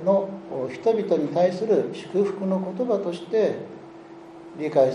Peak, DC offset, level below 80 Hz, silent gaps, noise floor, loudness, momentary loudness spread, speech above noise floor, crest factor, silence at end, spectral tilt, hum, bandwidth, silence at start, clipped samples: -6 dBFS; under 0.1%; -70 dBFS; none; -43 dBFS; -24 LUFS; 20 LU; 20 dB; 18 dB; 0 s; -7.5 dB/octave; none; 10.5 kHz; 0 s; under 0.1%